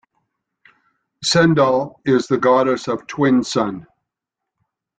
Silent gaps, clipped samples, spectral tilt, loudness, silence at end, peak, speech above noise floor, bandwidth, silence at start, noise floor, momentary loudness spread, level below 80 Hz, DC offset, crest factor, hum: none; under 0.1%; -5 dB/octave; -17 LUFS; 1.15 s; -2 dBFS; 66 dB; 9.4 kHz; 1.2 s; -83 dBFS; 10 LU; -56 dBFS; under 0.1%; 16 dB; none